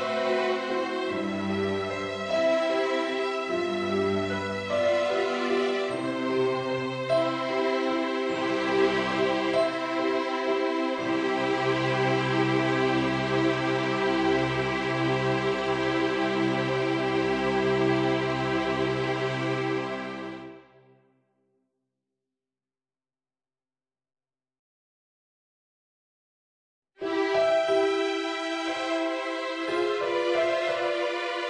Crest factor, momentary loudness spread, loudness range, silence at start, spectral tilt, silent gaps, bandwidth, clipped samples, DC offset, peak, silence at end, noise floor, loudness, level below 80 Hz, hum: 16 dB; 5 LU; 5 LU; 0 s; -5.5 dB/octave; 24.59-26.82 s; 10 kHz; under 0.1%; under 0.1%; -12 dBFS; 0 s; under -90 dBFS; -27 LUFS; -60 dBFS; none